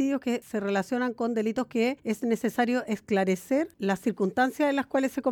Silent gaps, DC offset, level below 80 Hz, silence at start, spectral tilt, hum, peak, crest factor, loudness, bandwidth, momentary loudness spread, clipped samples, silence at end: none; under 0.1%; -68 dBFS; 0 s; -5.5 dB/octave; none; -12 dBFS; 14 dB; -28 LUFS; 18 kHz; 4 LU; under 0.1%; 0 s